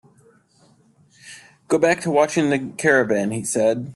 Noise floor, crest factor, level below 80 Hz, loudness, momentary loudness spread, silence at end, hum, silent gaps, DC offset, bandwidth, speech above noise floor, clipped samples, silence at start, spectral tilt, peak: -57 dBFS; 18 dB; -62 dBFS; -19 LUFS; 16 LU; 0 s; none; none; under 0.1%; 12.5 kHz; 38 dB; under 0.1%; 1.25 s; -5 dB/octave; -4 dBFS